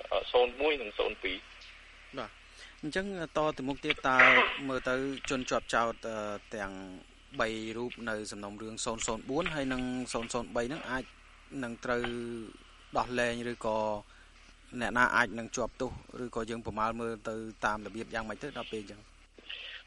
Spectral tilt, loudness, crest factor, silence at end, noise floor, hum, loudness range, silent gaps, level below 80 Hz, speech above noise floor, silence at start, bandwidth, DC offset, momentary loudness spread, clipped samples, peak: -3.5 dB/octave; -32 LUFS; 26 dB; 0.05 s; -56 dBFS; none; 9 LU; none; -54 dBFS; 23 dB; 0 s; 11.5 kHz; under 0.1%; 16 LU; under 0.1%; -8 dBFS